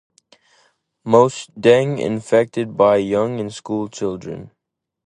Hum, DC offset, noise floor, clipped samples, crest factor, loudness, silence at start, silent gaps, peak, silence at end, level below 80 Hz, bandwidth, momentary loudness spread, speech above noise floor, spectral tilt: none; under 0.1%; -60 dBFS; under 0.1%; 18 dB; -18 LUFS; 1.05 s; none; 0 dBFS; 0.6 s; -56 dBFS; 10 kHz; 14 LU; 43 dB; -6 dB/octave